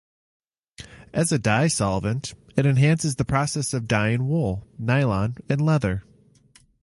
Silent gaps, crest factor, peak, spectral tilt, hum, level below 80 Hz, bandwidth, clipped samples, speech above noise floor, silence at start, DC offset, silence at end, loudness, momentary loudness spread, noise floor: none; 20 dB; -4 dBFS; -5.5 dB/octave; none; -46 dBFS; 11.5 kHz; under 0.1%; 35 dB; 0.8 s; under 0.1%; 0.8 s; -23 LUFS; 9 LU; -57 dBFS